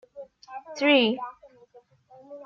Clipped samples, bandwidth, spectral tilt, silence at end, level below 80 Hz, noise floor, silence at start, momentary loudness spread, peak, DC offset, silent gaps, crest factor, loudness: under 0.1%; 7.2 kHz; -4.5 dB/octave; 0 s; -78 dBFS; -56 dBFS; 0.15 s; 26 LU; -8 dBFS; under 0.1%; none; 20 dB; -22 LUFS